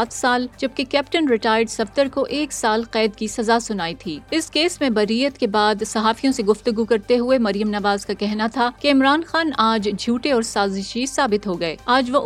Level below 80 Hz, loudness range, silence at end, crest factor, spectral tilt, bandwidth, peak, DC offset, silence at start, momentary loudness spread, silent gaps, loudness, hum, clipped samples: -50 dBFS; 2 LU; 0 s; 18 dB; -4 dB/octave; 14.5 kHz; -2 dBFS; under 0.1%; 0 s; 6 LU; none; -20 LUFS; none; under 0.1%